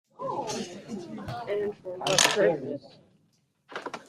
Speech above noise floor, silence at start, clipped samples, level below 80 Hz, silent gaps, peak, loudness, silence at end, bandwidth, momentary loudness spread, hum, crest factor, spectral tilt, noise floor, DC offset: 42 dB; 0.2 s; under 0.1%; -64 dBFS; none; -4 dBFS; -28 LUFS; 0.05 s; 15.5 kHz; 18 LU; none; 26 dB; -2 dB/octave; -69 dBFS; under 0.1%